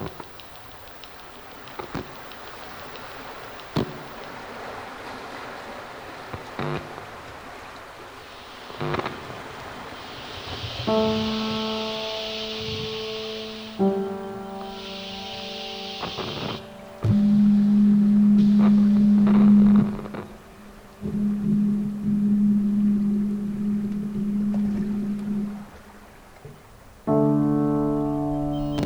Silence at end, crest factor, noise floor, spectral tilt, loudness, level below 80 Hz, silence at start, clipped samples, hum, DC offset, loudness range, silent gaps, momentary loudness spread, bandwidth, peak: 0 s; 18 dB; -47 dBFS; -7 dB/octave; -23 LUFS; -48 dBFS; 0 s; under 0.1%; none; under 0.1%; 16 LU; none; 21 LU; over 20 kHz; -6 dBFS